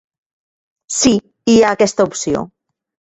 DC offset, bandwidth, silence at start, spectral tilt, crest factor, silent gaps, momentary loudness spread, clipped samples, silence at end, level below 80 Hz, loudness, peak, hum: under 0.1%; 8.2 kHz; 0.9 s; -3.5 dB/octave; 16 dB; none; 11 LU; under 0.1%; 0.6 s; -48 dBFS; -15 LUFS; -2 dBFS; none